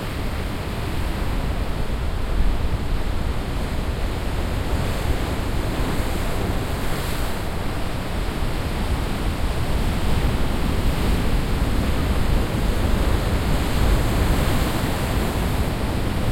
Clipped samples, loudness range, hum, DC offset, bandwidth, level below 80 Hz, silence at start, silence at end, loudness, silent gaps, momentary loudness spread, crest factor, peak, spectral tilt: under 0.1%; 4 LU; none; under 0.1%; 16.5 kHz; -24 dBFS; 0 s; 0 s; -24 LUFS; none; 5 LU; 14 dB; -6 dBFS; -5.5 dB/octave